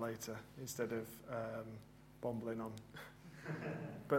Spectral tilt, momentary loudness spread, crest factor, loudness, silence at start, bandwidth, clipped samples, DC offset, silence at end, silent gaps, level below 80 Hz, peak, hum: -5.5 dB/octave; 12 LU; 22 dB; -46 LUFS; 0 s; 16 kHz; under 0.1%; under 0.1%; 0 s; none; -72 dBFS; -22 dBFS; none